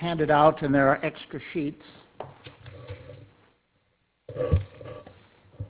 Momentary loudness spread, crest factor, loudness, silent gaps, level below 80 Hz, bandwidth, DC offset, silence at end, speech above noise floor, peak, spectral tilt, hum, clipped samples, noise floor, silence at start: 26 LU; 22 dB; -24 LUFS; none; -42 dBFS; 4 kHz; under 0.1%; 0 s; 47 dB; -6 dBFS; -10.5 dB/octave; none; under 0.1%; -71 dBFS; 0 s